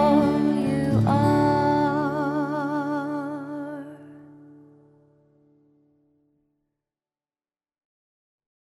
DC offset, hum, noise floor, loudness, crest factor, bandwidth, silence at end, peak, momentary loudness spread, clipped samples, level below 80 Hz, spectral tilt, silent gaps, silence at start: under 0.1%; none; under -90 dBFS; -23 LUFS; 16 dB; 12.5 kHz; 4.3 s; -8 dBFS; 14 LU; under 0.1%; -54 dBFS; -8 dB/octave; none; 0 s